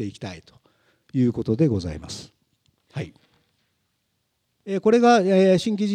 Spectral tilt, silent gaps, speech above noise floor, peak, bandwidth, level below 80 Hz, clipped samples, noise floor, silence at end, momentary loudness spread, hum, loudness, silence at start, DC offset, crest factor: -6.5 dB/octave; none; 53 dB; -6 dBFS; 10.5 kHz; -56 dBFS; under 0.1%; -73 dBFS; 0 s; 21 LU; none; -20 LUFS; 0 s; under 0.1%; 18 dB